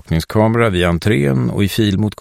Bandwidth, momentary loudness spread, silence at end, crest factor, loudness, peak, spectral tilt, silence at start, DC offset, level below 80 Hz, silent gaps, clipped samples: 16 kHz; 3 LU; 0.1 s; 14 dB; -15 LUFS; -2 dBFS; -6.5 dB/octave; 0.1 s; under 0.1%; -34 dBFS; none; under 0.1%